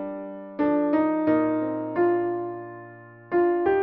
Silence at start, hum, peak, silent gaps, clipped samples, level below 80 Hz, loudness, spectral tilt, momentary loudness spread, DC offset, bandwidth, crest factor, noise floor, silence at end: 0 s; none; -10 dBFS; none; under 0.1%; -62 dBFS; -24 LUFS; -6.5 dB/octave; 15 LU; under 0.1%; 4.2 kHz; 14 dB; -45 dBFS; 0 s